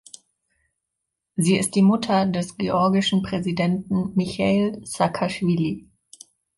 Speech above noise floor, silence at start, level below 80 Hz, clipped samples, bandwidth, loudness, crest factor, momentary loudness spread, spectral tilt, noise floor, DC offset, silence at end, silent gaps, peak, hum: 60 dB; 1.35 s; -54 dBFS; under 0.1%; 11.5 kHz; -22 LUFS; 16 dB; 7 LU; -5.5 dB/octave; -82 dBFS; under 0.1%; 0.75 s; none; -6 dBFS; none